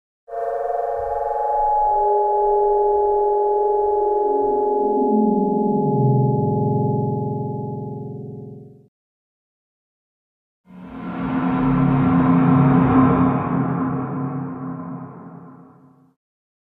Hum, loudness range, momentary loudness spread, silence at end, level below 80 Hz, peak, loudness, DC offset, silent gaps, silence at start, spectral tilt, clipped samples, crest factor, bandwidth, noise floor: none; 13 LU; 16 LU; 1 s; -44 dBFS; -4 dBFS; -19 LUFS; under 0.1%; 8.88-10.64 s; 0.3 s; -12 dB/octave; under 0.1%; 16 dB; 4 kHz; -50 dBFS